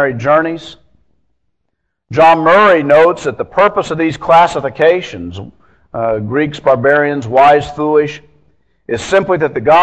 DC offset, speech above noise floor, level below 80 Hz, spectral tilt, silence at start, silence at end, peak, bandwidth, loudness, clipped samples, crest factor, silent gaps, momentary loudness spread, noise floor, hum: under 0.1%; 59 dB; -46 dBFS; -6 dB/octave; 0 s; 0 s; 0 dBFS; 9.2 kHz; -11 LUFS; 0.3%; 12 dB; none; 14 LU; -70 dBFS; none